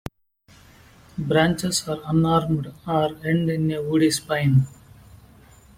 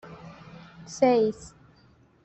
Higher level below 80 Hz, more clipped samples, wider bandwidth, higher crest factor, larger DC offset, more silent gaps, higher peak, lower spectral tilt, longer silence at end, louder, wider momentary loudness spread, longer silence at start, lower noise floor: first, -50 dBFS vs -62 dBFS; neither; first, 16 kHz vs 8.4 kHz; about the same, 18 dB vs 20 dB; neither; neither; about the same, -6 dBFS vs -8 dBFS; about the same, -5.5 dB/octave vs -5.5 dB/octave; first, 1.1 s vs 0.75 s; about the same, -22 LUFS vs -24 LUFS; second, 8 LU vs 25 LU; first, 1.15 s vs 0.05 s; about the same, -56 dBFS vs -59 dBFS